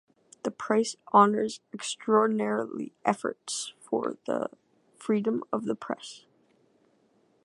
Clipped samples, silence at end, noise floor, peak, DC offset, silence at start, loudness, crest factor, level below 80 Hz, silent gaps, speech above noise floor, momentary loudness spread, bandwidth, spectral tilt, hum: under 0.1%; 1.25 s; -67 dBFS; -6 dBFS; under 0.1%; 0.45 s; -28 LUFS; 24 dB; -80 dBFS; none; 39 dB; 13 LU; 11.5 kHz; -4.5 dB/octave; none